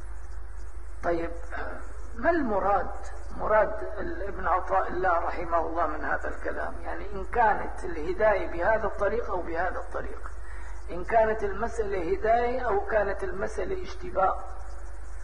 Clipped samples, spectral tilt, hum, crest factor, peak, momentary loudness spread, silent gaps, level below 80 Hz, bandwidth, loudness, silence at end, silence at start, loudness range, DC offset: under 0.1%; -6.5 dB/octave; none; 20 dB; -8 dBFS; 17 LU; none; -40 dBFS; 10 kHz; -28 LUFS; 0 s; 0 s; 2 LU; 3%